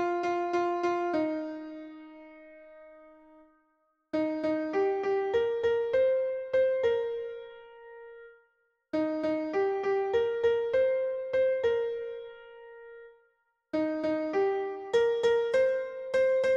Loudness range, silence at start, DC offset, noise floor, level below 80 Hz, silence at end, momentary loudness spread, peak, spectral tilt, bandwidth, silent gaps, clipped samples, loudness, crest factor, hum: 6 LU; 0 s; under 0.1%; -73 dBFS; -68 dBFS; 0 s; 22 LU; -16 dBFS; -5.5 dB/octave; 8 kHz; none; under 0.1%; -29 LUFS; 14 dB; none